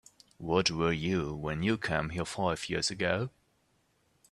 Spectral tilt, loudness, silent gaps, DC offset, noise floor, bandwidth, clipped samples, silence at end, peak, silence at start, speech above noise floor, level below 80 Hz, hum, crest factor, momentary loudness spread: -4.5 dB/octave; -31 LUFS; none; under 0.1%; -72 dBFS; 12.5 kHz; under 0.1%; 1.05 s; -12 dBFS; 0.4 s; 41 dB; -56 dBFS; none; 22 dB; 7 LU